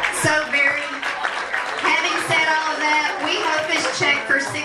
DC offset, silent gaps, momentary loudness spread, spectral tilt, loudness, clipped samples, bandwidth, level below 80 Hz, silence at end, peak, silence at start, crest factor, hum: under 0.1%; none; 6 LU; -2 dB/octave; -19 LUFS; under 0.1%; 13.5 kHz; -60 dBFS; 0 s; -4 dBFS; 0 s; 16 dB; none